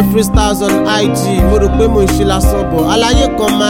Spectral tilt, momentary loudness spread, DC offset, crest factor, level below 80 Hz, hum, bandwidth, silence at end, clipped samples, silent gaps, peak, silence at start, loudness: -5 dB/octave; 2 LU; 0.4%; 10 dB; -18 dBFS; none; 17 kHz; 0 s; under 0.1%; none; 0 dBFS; 0 s; -11 LUFS